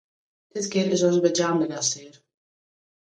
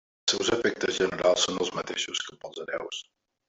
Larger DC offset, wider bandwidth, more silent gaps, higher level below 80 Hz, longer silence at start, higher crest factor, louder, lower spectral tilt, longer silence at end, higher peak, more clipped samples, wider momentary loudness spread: neither; first, 10 kHz vs 8.2 kHz; neither; second, -72 dBFS vs -64 dBFS; first, 0.55 s vs 0.25 s; about the same, 18 dB vs 20 dB; first, -23 LUFS vs -27 LUFS; first, -4 dB/octave vs -2 dB/octave; first, 0.95 s vs 0.45 s; first, -6 dBFS vs -10 dBFS; neither; about the same, 12 LU vs 14 LU